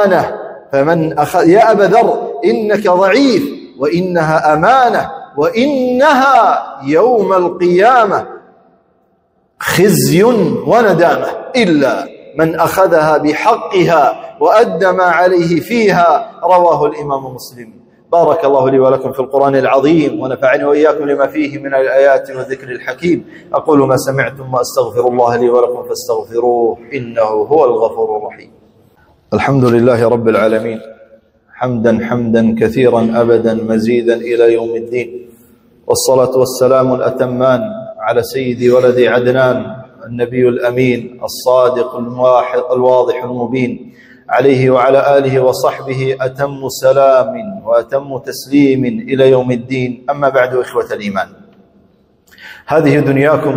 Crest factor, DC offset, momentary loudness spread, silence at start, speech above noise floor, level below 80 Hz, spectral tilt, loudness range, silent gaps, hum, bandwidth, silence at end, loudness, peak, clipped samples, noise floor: 12 dB; under 0.1%; 10 LU; 0 s; 46 dB; -50 dBFS; -6 dB/octave; 3 LU; none; none; 16.5 kHz; 0 s; -12 LUFS; 0 dBFS; 0.2%; -57 dBFS